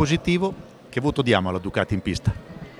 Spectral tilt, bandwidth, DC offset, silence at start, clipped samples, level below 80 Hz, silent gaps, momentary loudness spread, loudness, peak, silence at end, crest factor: -6 dB/octave; 12 kHz; under 0.1%; 0 s; under 0.1%; -42 dBFS; none; 10 LU; -24 LUFS; -2 dBFS; 0.05 s; 20 dB